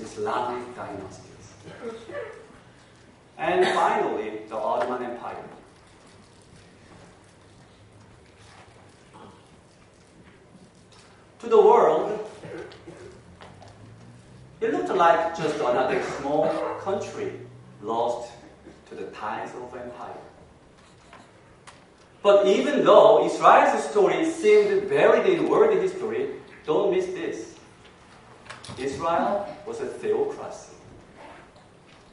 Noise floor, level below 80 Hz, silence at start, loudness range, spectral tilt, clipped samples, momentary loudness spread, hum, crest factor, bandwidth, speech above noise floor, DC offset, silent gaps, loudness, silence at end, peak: -54 dBFS; -62 dBFS; 0 s; 15 LU; -5 dB/octave; under 0.1%; 22 LU; none; 24 dB; 11 kHz; 31 dB; under 0.1%; none; -22 LUFS; 0.7 s; -2 dBFS